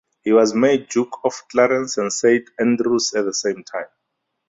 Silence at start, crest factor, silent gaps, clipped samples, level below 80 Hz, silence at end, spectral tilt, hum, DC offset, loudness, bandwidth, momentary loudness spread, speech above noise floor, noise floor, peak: 0.25 s; 16 dB; none; under 0.1%; -64 dBFS; 0.65 s; -3.5 dB/octave; none; under 0.1%; -19 LUFS; 8 kHz; 10 LU; 58 dB; -76 dBFS; -2 dBFS